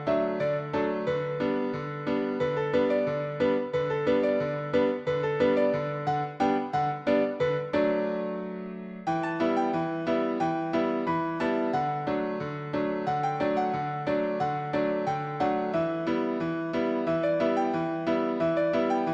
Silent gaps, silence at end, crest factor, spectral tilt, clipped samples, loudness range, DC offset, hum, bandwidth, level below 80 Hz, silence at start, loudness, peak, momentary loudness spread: none; 0 s; 16 dB; -7.5 dB/octave; under 0.1%; 2 LU; under 0.1%; none; 8 kHz; -62 dBFS; 0 s; -28 LUFS; -12 dBFS; 5 LU